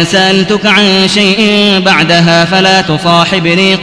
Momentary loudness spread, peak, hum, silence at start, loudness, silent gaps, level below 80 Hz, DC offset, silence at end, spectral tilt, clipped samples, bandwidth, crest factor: 2 LU; 0 dBFS; none; 0 s; -7 LUFS; none; -40 dBFS; 0.4%; 0 s; -4.5 dB/octave; 2%; 11 kHz; 8 dB